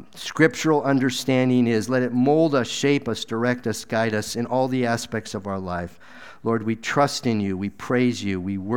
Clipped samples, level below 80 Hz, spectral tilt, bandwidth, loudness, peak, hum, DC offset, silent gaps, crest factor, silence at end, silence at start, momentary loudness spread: under 0.1%; -58 dBFS; -5.5 dB/octave; 17 kHz; -23 LUFS; -2 dBFS; none; 0.5%; none; 20 dB; 0 s; 0.15 s; 10 LU